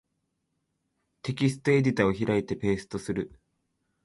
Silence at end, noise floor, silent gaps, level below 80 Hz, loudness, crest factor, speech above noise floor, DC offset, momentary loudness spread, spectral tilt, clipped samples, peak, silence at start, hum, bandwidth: 0.8 s; -78 dBFS; none; -56 dBFS; -27 LUFS; 20 dB; 52 dB; under 0.1%; 12 LU; -7 dB/octave; under 0.1%; -10 dBFS; 1.25 s; none; 11.5 kHz